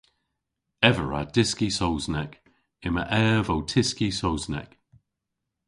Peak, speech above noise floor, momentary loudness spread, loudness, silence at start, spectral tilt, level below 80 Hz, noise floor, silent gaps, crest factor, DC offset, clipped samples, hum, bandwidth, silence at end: 0 dBFS; 58 dB; 11 LU; -25 LUFS; 0.8 s; -4.5 dB/octave; -44 dBFS; -83 dBFS; none; 26 dB; under 0.1%; under 0.1%; none; 11.5 kHz; 1 s